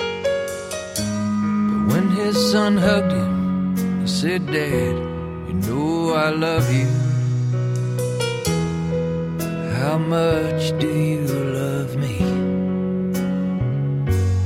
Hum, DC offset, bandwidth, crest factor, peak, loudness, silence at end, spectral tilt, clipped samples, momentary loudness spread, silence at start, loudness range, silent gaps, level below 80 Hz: none; under 0.1%; 16.5 kHz; 14 dB; -6 dBFS; -21 LUFS; 0 s; -6.5 dB/octave; under 0.1%; 6 LU; 0 s; 3 LU; none; -42 dBFS